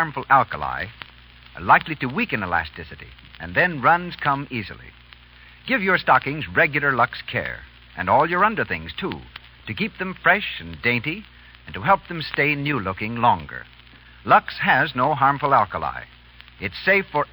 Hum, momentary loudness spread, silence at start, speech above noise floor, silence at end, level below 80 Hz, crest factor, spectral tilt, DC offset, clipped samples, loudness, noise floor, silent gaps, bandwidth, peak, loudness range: 60 Hz at -50 dBFS; 19 LU; 0 s; 26 dB; 0.1 s; -48 dBFS; 20 dB; -9.5 dB/octave; under 0.1%; under 0.1%; -21 LUFS; -47 dBFS; none; over 20 kHz; -2 dBFS; 3 LU